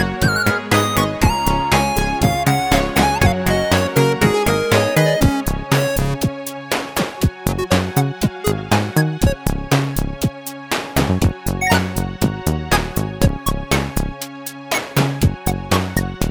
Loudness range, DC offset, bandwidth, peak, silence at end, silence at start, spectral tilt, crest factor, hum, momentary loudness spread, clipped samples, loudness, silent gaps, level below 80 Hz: 4 LU; under 0.1%; over 20 kHz; 0 dBFS; 0 s; 0 s; -5 dB/octave; 18 dB; none; 8 LU; under 0.1%; -18 LUFS; none; -28 dBFS